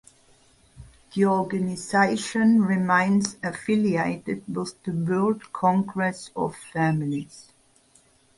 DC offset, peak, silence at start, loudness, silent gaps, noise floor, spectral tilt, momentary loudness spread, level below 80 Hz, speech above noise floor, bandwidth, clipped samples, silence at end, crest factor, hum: under 0.1%; -6 dBFS; 0.8 s; -24 LUFS; none; -60 dBFS; -6 dB/octave; 11 LU; -60 dBFS; 36 dB; 11.5 kHz; under 0.1%; 0.95 s; 18 dB; none